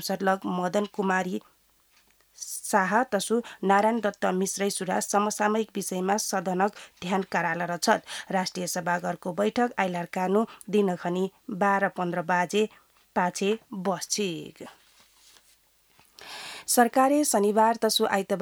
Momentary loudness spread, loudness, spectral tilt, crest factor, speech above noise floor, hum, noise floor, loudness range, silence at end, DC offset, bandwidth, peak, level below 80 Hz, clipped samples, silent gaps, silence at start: 10 LU; -26 LUFS; -4 dB/octave; 20 dB; 37 dB; none; -64 dBFS; 4 LU; 0 s; under 0.1%; over 20 kHz; -6 dBFS; -74 dBFS; under 0.1%; none; 0 s